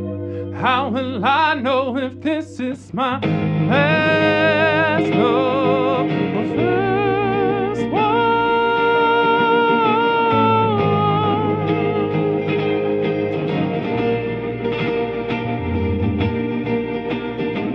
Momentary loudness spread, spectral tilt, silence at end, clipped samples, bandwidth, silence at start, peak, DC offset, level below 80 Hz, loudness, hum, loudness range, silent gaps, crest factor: 8 LU; -8 dB/octave; 0 s; under 0.1%; 8.6 kHz; 0 s; -4 dBFS; under 0.1%; -46 dBFS; -18 LUFS; none; 5 LU; none; 14 dB